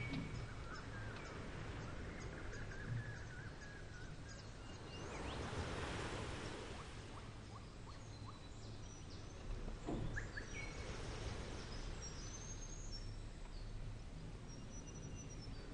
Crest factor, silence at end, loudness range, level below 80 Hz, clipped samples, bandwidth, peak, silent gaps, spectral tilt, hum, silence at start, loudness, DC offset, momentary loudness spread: 16 dB; 0 s; 4 LU; -52 dBFS; under 0.1%; 10.5 kHz; -32 dBFS; none; -4.5 dB/octave; none; 0 s; -50 LUFS; under 0.1%; 8 LU